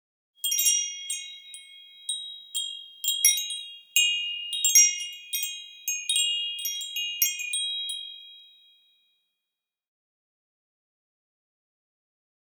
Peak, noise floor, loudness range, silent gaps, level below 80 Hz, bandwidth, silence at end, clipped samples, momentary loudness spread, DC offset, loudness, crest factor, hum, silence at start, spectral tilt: -6 dBFS; -88 dBFS; 9 LU; none; under -90 dBFS; over 20 kHz; 4.15 s; under 0.1%; 15 LU; under 0.1%; -24 LUFS; 24 dB; none; 0.45 s; 10 dB/octave